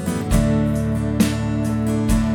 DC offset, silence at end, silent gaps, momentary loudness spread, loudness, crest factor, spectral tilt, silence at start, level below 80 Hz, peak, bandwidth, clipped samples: under 0.1%; 0 s; none; 3 LU; -20 LUFS; 14 dB; -6.5 dB/octave; 0 s; -28 dBFS; -4 dBFS; 18 kHz; under 0.1%